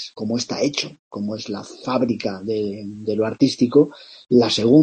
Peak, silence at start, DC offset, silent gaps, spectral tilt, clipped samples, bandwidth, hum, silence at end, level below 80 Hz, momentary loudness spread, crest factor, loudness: -2 dBFS; 0 s; under 0.1%; 0.99-1.11 s; -5.5 dB/octave; under 0.1%; 8.8 kHz; none; 0 s; -62 dBFS; 13 LU; 18 dB; -21 LUFS